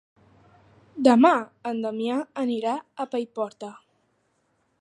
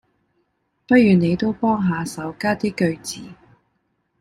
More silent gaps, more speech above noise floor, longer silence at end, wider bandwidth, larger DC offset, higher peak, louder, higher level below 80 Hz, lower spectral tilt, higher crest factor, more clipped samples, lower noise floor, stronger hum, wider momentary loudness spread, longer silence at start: neither; second, 47 dB vs 51 dB; first, 1.05 s vs 0.9 s; second, 10.5 kHz vs 13.5 kHz; neither; about the same, -4 dBFS vs -2 dBFS; second, -24 LUFS vs -19 LUFS; second, -76 dBFS vs -54 dBFS; about the same, -5.5 dB/octave vs -6.5 dB/octave; about the same, 22 dB vs 18 dB; neither; about the same, -70 dBFS vs -70 dBFS; neither; about the same, 15 LU vs 15 LU; about the same, 0.95 s vs 0.9 s